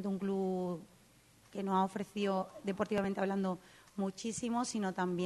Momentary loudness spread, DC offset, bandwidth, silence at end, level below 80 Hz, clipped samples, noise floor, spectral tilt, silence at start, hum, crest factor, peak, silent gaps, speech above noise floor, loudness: 8 LU; under 0.1%; 12 kHz; 0 s; -72 dBFS; under 0.1%; -64 dBFS; -5.5 dB/octave; 0 s; none; 18 dB; -20 dBFS; none; 29 dB; -37 LUFS